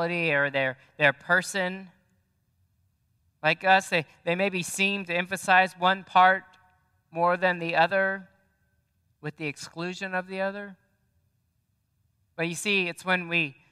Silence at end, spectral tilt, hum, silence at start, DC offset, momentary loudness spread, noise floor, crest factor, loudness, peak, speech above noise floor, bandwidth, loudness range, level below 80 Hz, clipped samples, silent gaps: 0.2 s; -4 dB/octave; none; 0 s; under 0.1%; 14 LU; -73 dBFS; 22 dB; -25 LUFS; -6 dBFS; 47 dB; 15 kHz; 12 LU; -76 dBFS; under 0.1%; none